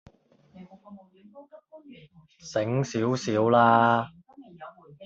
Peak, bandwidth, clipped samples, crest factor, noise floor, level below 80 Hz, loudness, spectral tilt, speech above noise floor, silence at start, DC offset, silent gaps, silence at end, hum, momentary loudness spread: -6 dBFS; 7.8 kHz; under 0.1%; 20 dB; -57 dBFS; -68 dBFS; -23 LUFS; -6 dB/octave; 32 dB; 0.55 s; under 0.1%; none; 0 s; none; 27 LU